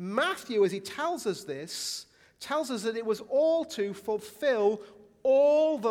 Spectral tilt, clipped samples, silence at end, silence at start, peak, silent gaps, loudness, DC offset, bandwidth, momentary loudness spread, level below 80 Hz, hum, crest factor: -4 dB/octave; under 0.1%; 0 s; 0 s; -12 dBFS; none; -29 LUFS; under 0.1%; 16.5 kHz; 11 LU; -74 dBFS; none; 16 dB